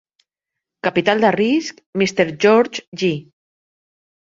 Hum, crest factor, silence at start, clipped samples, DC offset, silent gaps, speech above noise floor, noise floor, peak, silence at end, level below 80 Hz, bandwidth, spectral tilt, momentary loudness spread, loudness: none; 20 dB; 0.85 s; under 0.1%; under 0.1%; 1.86-1.93 s, 2.87-2.92 s; 66 dB; -83 dBFS; 0 dBFS; 1 s; -62 dBFS; 7.8 kHz; -5 dB/octave; 9 LU; -18 LUFS